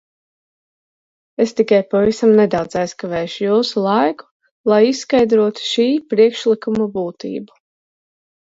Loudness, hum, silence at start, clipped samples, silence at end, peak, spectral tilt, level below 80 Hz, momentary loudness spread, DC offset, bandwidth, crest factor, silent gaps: -16 LUFS; none; 1.4 s; under 0.1%; 1 s; -2 dBFS; -5.5 dB/octave; -56 dBFS; 11 LU; under 0.1%; 7.8 kHz; 16 dB; 4.31-4.40 s, 4.51-4.64 s